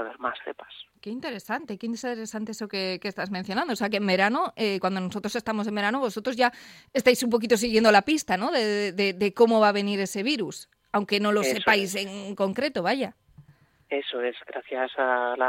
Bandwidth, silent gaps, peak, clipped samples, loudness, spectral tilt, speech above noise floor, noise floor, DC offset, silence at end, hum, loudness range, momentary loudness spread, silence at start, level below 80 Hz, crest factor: 16.5 kHz; none; -4 dBFS; under 0.1%; -25 LUFS; -4 dB/octave; 33 dB; -59 dBFS; under 0.1%; 0 s; none; 8 LU; 13 LU; 0 s; -64 dBFS; 22 dB